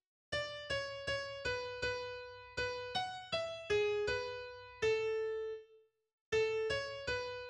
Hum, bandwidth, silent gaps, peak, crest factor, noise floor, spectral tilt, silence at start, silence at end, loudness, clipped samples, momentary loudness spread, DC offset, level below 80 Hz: none; 10.5 kHz; 6.13-6.32 s; -24 dBFS; 16 dB; -67 dBFS; -3 dB/octave; 0.3 s; 0 s; -38 LUFS; under 0.1%; 10 LU; under 0.1%; -62 dBFS